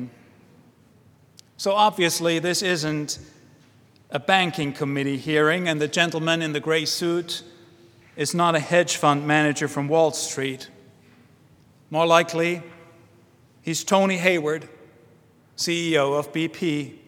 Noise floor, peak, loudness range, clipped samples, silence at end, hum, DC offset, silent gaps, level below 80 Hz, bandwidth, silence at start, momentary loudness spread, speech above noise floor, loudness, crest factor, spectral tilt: -55 dBFS; 0 dBFS; 3 LU; under 0.1%; 0.1 s; none; under 0.1%; none; -68 dBFS; 18 kHz; 0 s; 11 LU; 33 dB; -22 LUFS; 24 dB; -4 dB/octave